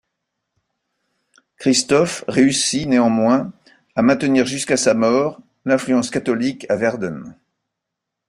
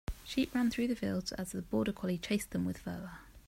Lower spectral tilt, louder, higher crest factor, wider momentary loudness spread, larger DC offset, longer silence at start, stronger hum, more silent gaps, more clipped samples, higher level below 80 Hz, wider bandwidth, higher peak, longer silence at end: second, -4 dB/octave vs -5.5 dB/octave; first, -18 LUFS vs -36 LUFS; about the same, 18 dB vs 18 dB; about the same, 10 LU vs 10 LU; neither; first, 1.6 s vs 0.1 s; neither; neither; neither; second, -58 dBFS vs -52 dBFS; second, 11.5 kHz vs 16 kHz; first, -2 dBFS vs -18 dBFS; first, 0.95 s vs 0.05 s